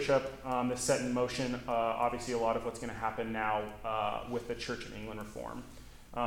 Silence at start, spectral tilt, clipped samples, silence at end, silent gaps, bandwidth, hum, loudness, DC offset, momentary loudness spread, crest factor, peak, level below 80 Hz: 0 s; -4.5 dB/octave; under 0.1%; 0 s; none; 18 kHz; none; -35 LUFS; under 0.1%; 12 LU; 18 dB; -16 dBFS; -54 dBFS